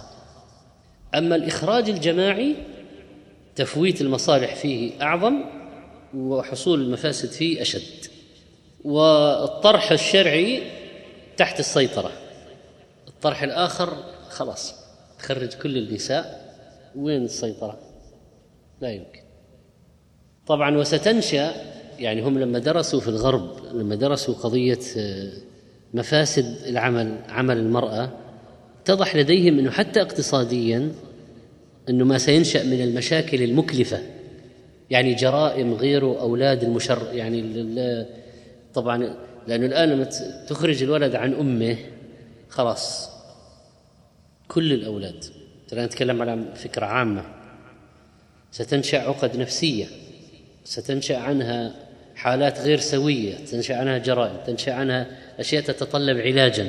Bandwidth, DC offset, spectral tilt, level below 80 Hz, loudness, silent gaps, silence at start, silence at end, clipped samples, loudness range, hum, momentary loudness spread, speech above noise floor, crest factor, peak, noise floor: 12 kHz; under 0.1%; -5 dB/octave; -58 dBFS; -22 LUFS; none; 0 s; 0 s; under 0.1%; 8 LU; none; 17 LU; 34 dB; 22 dB; -2 dBFS; -56 dBFS